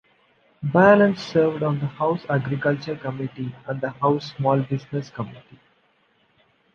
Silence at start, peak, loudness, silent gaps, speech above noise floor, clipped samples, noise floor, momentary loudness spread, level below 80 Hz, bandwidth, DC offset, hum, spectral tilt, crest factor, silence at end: 0.6 s; -2 dBFS; -22 LUFS; none; 42 dB; under 0.1%; -63 dBFS; 15 LU; -62 dBFS; 7 kHz; under 0.1%; none; -8 dB/octave; 22 dB; 1.35 s